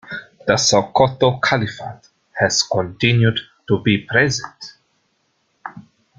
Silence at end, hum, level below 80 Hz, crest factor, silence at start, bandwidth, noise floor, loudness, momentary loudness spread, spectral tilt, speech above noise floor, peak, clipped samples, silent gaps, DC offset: 0.4 s; none; -52 dBFS; 18 dB; 0.05 s; 9.4 kHz; -66 dBFS; -17 LUFS; 21 LU; -4 dB/octave; 49 dB; -2 dBFS; under 0.1%; none; under 0.1%